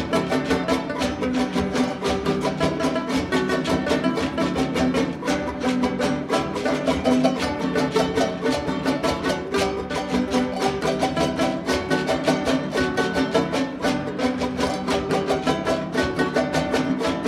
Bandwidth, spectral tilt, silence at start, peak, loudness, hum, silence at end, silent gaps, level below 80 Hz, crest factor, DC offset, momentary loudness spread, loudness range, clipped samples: 14.5 kHz; -5 dB/octave; 0 s; -6 dBFS; -23 LUFS; none; 0 s; none; -44 dBFS; 18 dB; under 0.1%; 3 LU; 1 LU; under 0.1%